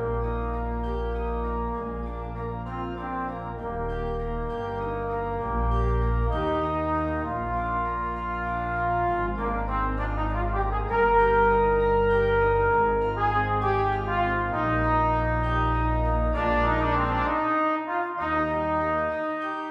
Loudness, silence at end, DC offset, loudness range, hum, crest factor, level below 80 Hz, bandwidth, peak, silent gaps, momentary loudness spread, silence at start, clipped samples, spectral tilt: -26 LUFS; 0 s; under 0.1%; 9 LU; none; 14 dB; -32 dBFS; 5.6 kHz; -10 dBFS; none; 9 LU; 0 s; under 0.1%; -8.5 dB/octave